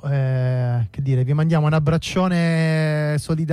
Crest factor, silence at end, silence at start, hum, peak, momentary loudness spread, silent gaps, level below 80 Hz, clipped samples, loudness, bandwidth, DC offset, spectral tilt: 10 dB; 0 s; 0.05 s; none; -10 dBFS; 4 LU; none; -46 dBFS; under 0.1%; -20 LUFS; 11.5 kHz; under 0.1%; -7.5 dB/octave